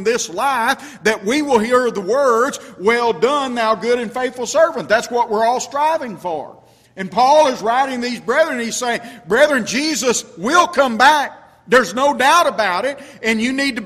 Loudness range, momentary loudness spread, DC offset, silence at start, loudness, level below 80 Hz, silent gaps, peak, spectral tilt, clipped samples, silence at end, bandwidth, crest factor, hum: 3 LU; 10 LU; under 0.1%; 0 s; -16 LUFS; -56 dBFS; none; 0 dBFS; -3 dB/octave; under 0.1%; 0 s; 15.5 kHz; 16 dB; none